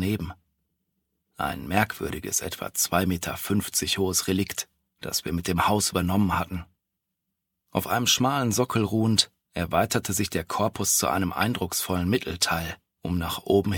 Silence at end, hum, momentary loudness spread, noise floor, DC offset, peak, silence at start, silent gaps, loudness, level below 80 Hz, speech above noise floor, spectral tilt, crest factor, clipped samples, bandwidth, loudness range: 0 s; none; 10 LU; -82 dBFS; under 0.1%; -6 dBFS; 0 s; none; -25 LUFS; -48 dBFS; 57 dB; -3.5 dB/octave; 22 dB; under 0.1%; 19 kHz; 3 LU